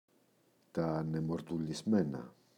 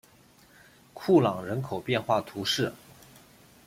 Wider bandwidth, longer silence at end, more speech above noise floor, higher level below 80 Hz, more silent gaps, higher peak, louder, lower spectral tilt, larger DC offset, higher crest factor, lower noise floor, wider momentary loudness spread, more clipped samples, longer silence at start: second, 12 kHz vs 16 kHz; second, 0.25 s vs 0.9 s; first, 36 dB vs 31 dB; about the same, -66 dBFS vs -66 dBFS; neither; second, -20 dBFS vs -10 dBFS; second, -36 LUFS vs -27 LUFS; first, -7.5 dB/octave vs -5.5 dB/octave; neither; about the same, 18 dB vs 20 dB; first, -71 dBFS vs -58 dBFS; about the same, 8 LU vs 10 LU; neither; second, 0.75 s vs 0.95 s